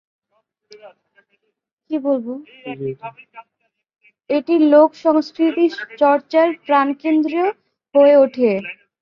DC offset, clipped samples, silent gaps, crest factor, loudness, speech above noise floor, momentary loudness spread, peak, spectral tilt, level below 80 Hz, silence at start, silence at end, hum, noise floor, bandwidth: under 0.1%; under 0.1%; 1.73-1.77 s; 16 dB; -17 LUFS; 51 dB; 16 LU; -2 dBFS; -7 dB/octave; -68 dBFS; 0.85 s; 0.3 s; none; -68 dBFS; 6.6 kHz